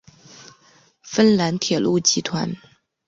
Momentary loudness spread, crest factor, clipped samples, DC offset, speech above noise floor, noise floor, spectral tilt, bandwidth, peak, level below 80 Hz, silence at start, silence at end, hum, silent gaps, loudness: 11 LU; 20 dB; under 0.1%; under 0.1%; 37 dB; -56 dBFS; -4 dB/octave; 7.8 kHz; -2 dBFS; -60 dBFS; 0.4 s; 0.5 s; none; none; -19 LUFS